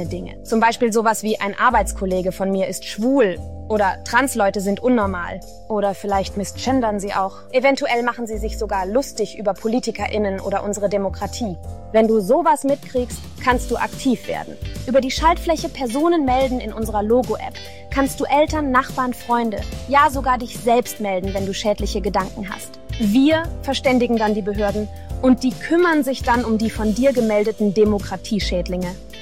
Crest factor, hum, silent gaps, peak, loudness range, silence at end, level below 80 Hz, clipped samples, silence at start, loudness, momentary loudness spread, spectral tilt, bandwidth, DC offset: 18 dB; none; none; -2 dBFS; 3 LU; 0 s; -36 dBFS; under 0.1%; 0 s; -20 LUFS; 10 LU; -5 dB/octave; 16.5 kHz; 1%